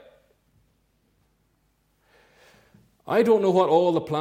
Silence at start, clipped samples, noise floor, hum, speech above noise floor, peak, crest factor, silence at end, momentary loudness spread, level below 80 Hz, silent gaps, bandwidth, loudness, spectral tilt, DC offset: 3.05 s; under 0.1%; -68 dBFS; none; 48 dB; -8 dBFS; 18 dB; 0 s; 4 LU; -68 dBFS; none; 15.5 kHz; -21 LUFS; -7 dB/octave; under 0.1%